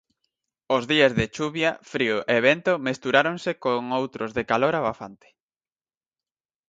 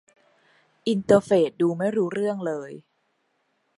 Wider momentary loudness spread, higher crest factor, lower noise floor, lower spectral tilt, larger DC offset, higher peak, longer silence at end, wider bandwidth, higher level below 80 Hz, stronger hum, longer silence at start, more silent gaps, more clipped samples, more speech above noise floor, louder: second, 9 LU vs 13 LU; about the same, 20 dB vs 22 dB; first, under -90 dBFS vs -71 dBFS; second, -5 dB/octave vs -6.5 dB/octave; neither; about the same, -4 dBFS vs -4 dBFS; first, 1.55 s vs 0.95 s; second, 7.8 kHz vs 11.5 kHz; first, -56 dBFS vs -66 dBFS; neither; second, 0.7 s vs 0.85 s; neither; neither; first, over 67 dB vs 49 dB; about the same, -23 LUFS vs -23 LUFS